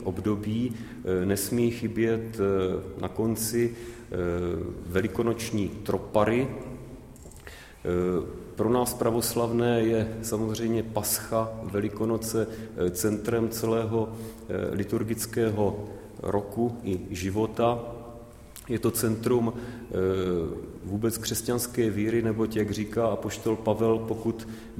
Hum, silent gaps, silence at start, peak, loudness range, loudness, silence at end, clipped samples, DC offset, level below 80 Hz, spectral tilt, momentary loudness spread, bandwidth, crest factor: none; none; 0 s; -8 dBFS; 3 LU; -28 LUFS; 0 s; under 0.1%; under 0.1%; -50 dBFS; -5.5 dB/octave; 11 LU; 16.5 kHz; 20 dB